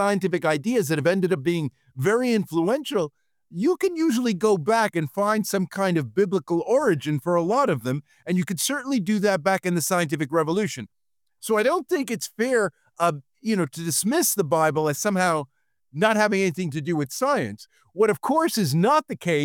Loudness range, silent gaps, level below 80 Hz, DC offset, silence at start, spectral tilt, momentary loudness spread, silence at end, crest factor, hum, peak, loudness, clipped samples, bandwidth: 2 LU; none; -68 dBFS; under 0.1%; 0 s; -5 dB/octave; 7 LU; 0 s; 16 dB; none; -6 dBFS; -23 LUFS; under 0.1%; 19.5 kHz